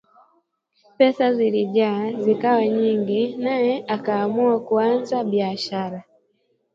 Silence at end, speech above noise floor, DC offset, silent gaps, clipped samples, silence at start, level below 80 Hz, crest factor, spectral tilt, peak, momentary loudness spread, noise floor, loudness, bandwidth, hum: 0.75 s; 47 dB; under 0.1%; none; under 0.1%; 1 s; -72 dBFS; 18 dB; -7 dB/octave; -4 dBFS; 6 LU; -67 dBFS; -21 LUFS; 7.6 kHz; none